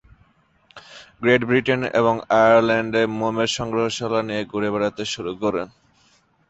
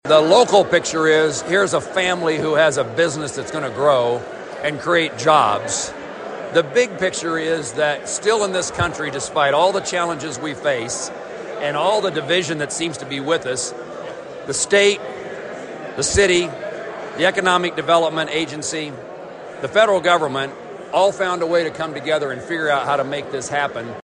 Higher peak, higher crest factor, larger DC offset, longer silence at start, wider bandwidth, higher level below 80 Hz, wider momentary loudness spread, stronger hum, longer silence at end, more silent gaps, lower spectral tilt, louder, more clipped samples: about the same, -2 dBFS vs 0 dBFS; about the same, 18 dB vs 18 dB; neither; first, 0.75 s vs 0.05 s; second, 8.2 kHz vs 10.5 kHz; about the same, -54 dBFS vs -50 dBFS; second, 10 LU vs 15 LU; neither; first, 0.85 s vs 0.05 s; neither; first, -5 dB/octave vs -3 dB/octave; about the same, -20 LUFS vs -19 LUFS; neither